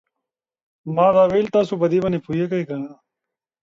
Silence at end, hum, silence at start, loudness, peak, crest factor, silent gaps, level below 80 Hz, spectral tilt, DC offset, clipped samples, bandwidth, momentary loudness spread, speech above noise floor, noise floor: 0.7 s; none; 0.85 s; -19 LUFS; -4 dBFS; 16 dB; none; -56 dBFS; -8 dB/octave; under 0.1%; under 0.1%; 7.6 kHz; 15 LU; 66 dB; -85 dBFS